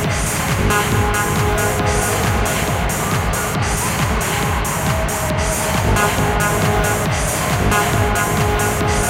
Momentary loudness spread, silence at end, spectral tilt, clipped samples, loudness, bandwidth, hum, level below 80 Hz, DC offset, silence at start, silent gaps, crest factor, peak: 3 LU; 0 s; -4 dB/octave; under 0.1%; -17 LUFS; 17 kHz; none; -26 dBFS; under 0.1%; 0 s; none; 14 dB; -2 dBFS